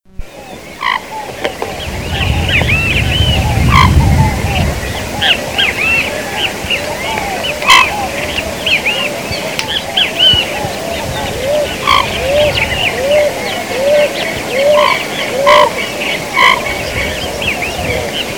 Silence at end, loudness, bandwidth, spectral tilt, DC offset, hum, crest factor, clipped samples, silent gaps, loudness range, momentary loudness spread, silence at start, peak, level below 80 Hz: 0 s; -12 LUFS; over 20 kHz; -3.5 dB/octave; 0.5%; none; 14 dB; 0.5%; none; 2 LU; 10 LU; 0.2 s; 0 dBFS; -24 dBFS